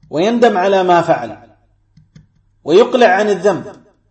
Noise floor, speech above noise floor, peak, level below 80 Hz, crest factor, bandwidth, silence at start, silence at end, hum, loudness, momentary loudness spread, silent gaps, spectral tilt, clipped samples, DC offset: -52 dBFS; 40 dB; 0 dBFS; -58 dBFS; 14 dB; 8.6 kHz; 0.1 s; 0.4 s; none; -13 LUFS; 10 LU; none; -5.5 dB/octave; under 0.1%; under 0.1%